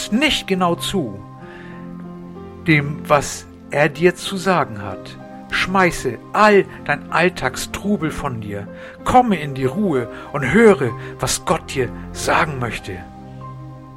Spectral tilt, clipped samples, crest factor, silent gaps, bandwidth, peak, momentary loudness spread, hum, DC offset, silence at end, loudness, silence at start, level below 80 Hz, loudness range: -4.5 dB/octave; under 0.1%; 18 dB; none; 16 kHz; 0 dBFS; 20 LU; none; under 0.1%; 0 s; -18 LUFS; 0 s; -42 dBFS; 3 LU